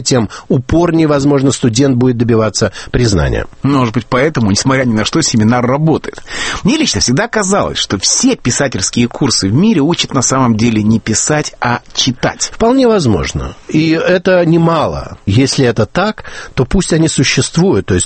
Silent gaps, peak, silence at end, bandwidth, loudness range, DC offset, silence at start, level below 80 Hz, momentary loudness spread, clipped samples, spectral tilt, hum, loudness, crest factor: none; 0 dBFS; 0 s; 8.8 kHz; 1 LU; under 0.1%; 0 s; -30 dBFS; 6 LU; under 0.1%; -4.5 dB/octave; none; -12 LUFS; 12 dB